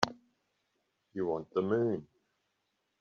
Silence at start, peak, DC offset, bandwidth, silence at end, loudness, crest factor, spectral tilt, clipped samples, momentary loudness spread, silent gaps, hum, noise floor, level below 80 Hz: 0 s; -6 dBFS; under 0.1%; 7.4 kHz; 0.95 s; -34 LUFS; 32 dB; -4.5 dB/octave; under 0.1%; 9 LU; none; none; -81 dBFS; -72 dBFS